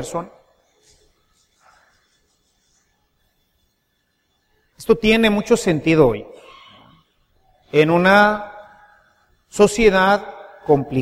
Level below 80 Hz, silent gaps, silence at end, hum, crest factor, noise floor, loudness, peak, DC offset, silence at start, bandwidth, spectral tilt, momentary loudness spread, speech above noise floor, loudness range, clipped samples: -44 dBFS; none; 0 s; none; 20 dB; -68 dBFS; -16 LUFS; 0 dBFS; under 0.1%; 0 s; 15.5 kHz; -5.5 dB/octave; 20 LU; 53 dB; 5 LU; under 0.1%